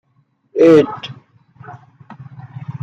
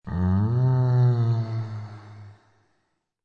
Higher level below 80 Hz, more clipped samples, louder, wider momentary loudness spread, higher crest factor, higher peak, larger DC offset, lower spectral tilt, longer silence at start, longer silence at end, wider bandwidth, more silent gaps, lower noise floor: second, -62 dBFS vs -54 dBFS; neither; first, -12 LUFS vs -23 LUFS; first, 26 LU vs 17 LU; about the same, 16 dB vs 12 dB; first, -2 dBFS vs -12 dBFS; neither; second, -7.5 dB/octave vs -10.5 dB/octave; first, 0.55 s vs 0.05 s; second, 0.05 s vs 0.95 s; first, 7.8 kHz vs 4.7 kHz; neither; second, -61 dBFS vs -74 dBFS